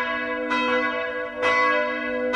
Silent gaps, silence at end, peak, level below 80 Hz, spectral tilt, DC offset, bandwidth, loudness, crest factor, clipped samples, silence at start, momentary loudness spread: none; 0 s; -8 dBFS; -56 dBFS; -3.5 dB/octave; under 0.1%; 9.8 kHz; -23 LUFS; 14 dB; under 0.1%; 0 s; 7 LU